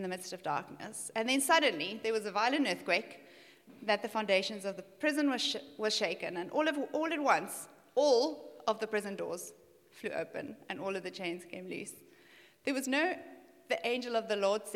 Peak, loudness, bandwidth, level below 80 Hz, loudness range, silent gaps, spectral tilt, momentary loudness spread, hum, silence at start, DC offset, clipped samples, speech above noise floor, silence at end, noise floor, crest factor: -12 dBFS; -33 LUFS; 16.5 kHz; -90 dBFS; 7 LU; none; -3 dB/octave; 14 LU; none; 0 s; under 0.1%; under 0.1%; 27 dB; 0 s; -61 dBFS; 22 dB